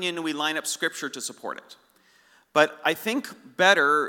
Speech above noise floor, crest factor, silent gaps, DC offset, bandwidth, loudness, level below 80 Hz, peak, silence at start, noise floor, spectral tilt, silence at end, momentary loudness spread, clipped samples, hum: 35 dB; 24 dB; none; under 0.1%; 19 kHz; -24 LUFS; -86 dBFS; -2 dBFS; 0 s; -60 dBFS; -2 dB/octave; 0 s; 18 LU; under 0.1%; none